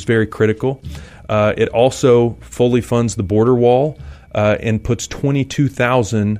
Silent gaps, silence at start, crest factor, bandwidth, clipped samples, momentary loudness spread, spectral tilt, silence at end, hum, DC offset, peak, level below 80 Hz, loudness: none; 0 s; 14 dB; 14 kHz; under 0.1%; 9 LU; -6.5 dB/octave; 0 s; none; under 0.1%; 0 dBFS; -38 dBFS; -16 LUFS